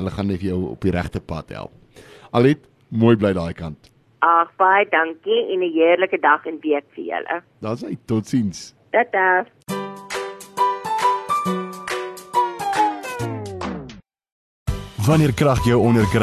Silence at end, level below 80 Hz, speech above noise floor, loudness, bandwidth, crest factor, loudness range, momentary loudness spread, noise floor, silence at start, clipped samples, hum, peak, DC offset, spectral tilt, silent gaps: 0 s; -40 dBFS; 23 dB; -20 LUFS; 14 kHz; 18 dB; 5 LU; 13 LU; -42 dBFS; 0 s; under 0.1%; none; -2 dBFS; under 0.1%; -6.5 dB/octave; 14.32-14.66 s